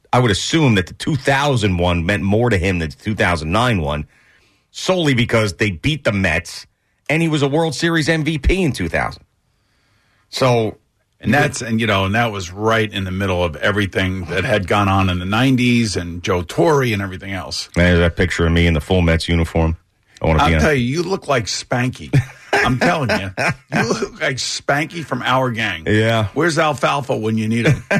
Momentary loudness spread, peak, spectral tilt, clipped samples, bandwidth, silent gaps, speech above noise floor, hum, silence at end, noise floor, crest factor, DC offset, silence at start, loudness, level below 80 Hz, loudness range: 7 LU; -4 dBFS; -5.5 dB/octave; under 0.1%; 13.5 kHz; none; 46 dB; none; 0 s; -63 dBFS; 12 dB; under 0.1%; 0.15 s; -17 LUFS; -32 dBFS; 3 LU